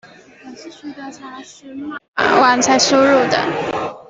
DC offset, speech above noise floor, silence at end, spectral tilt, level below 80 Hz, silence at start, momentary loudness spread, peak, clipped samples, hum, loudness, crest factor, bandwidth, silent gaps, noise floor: under 0.1%; 23 dB; 0.1 s; -2.5 dB/octave; -58 dBFS; 0.05 s; 22 LU; 0 dBFS; under 0.1%; none; -14 LUFS; 16 dB; 8 kHz; 2.08-2.13 s; -39 dBFS